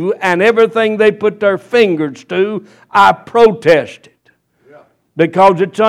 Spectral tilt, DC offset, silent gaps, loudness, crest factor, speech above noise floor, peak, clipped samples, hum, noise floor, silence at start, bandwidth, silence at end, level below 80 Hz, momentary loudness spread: -6 dB/octave; under 0.1%; none; -12 LUFS; 12 dB; 44 dB; 0 dBFS; 0.3%; none; -56 dBFS; 0 s; 12 kHz; 0 s; -54 dBFS; 9 LU